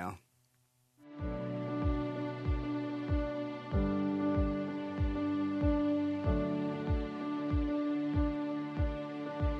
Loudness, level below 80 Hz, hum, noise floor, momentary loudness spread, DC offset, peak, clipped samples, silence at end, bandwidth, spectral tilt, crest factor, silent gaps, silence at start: -35 LUFS; -42 dBFS; none; -73 dBFS; 7 LU; under 0.1%; -20 dBFS; under 0.1%; 0 s; 6.2 kHz; -9 dB/octave; 14 dB; none; 0 s